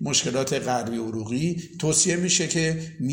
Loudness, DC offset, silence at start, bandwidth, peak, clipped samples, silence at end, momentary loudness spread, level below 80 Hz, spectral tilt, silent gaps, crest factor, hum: -24 LUFS; under 0.1%; 0 s; 16.5 kHz; -6 dBFS; under 0.1%; 0 s; 9 LU; -56 dBFS; -3.5 dB/octave; none; 18 dB; none